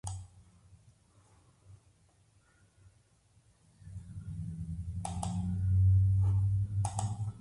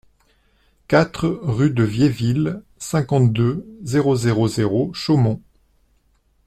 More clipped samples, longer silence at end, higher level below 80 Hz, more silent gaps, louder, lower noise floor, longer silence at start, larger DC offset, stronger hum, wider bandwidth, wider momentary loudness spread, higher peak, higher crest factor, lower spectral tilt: neither; second, 0 s vs 1.1 s; about the same, -44 dBFS vs -48 dBFS; neither; second, -32 LUFS vs -19 LUFS; first, -67 dBFS vs -61 dBFS; second, 0.05 s vs 0.9 s; neither; neither; second, 11.5 kHz vs 13 kHz; first, 20 LU vs 6 LU; second, -16 dBFS vs -2 dBFS; about the same, 18 dB vs 18 dB; about the same, -7 dB/octave vs -7 dB/octave